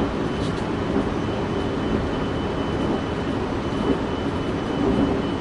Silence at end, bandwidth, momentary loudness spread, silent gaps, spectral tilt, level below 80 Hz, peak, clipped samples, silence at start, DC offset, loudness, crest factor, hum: 0 s; 11 kHz; 3 LU; none; -7 dB/octave; -36 dBFS; -8 dBFS; under 0.1%; 0 s; under 0.1%; -24 LUFS; 16 dB; none